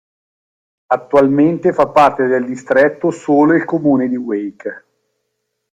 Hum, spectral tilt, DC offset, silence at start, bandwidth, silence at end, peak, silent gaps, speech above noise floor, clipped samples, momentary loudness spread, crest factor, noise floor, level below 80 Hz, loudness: none; -7.5 dB/octave; under 0.1%; 0.9 s; 9 kHz; 1 s; 0 dBFS; none; 59 dB; under 0.1%; 10 LU; 16 dB; -72 dBFS; -54 dBFS; -14 LUFS